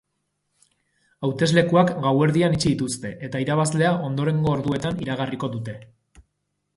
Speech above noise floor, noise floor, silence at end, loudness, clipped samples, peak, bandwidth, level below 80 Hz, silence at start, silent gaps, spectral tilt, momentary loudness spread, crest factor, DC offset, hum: 54 dB; -76 dBFS; 0.9 s; -22 LUFS; under 0.1%; -4 dBFS; 11.5 kHz; -52 dBFS; 1.2 s; none; -6 dB/octave; 11 LU; 20 dB; under 0.1%; none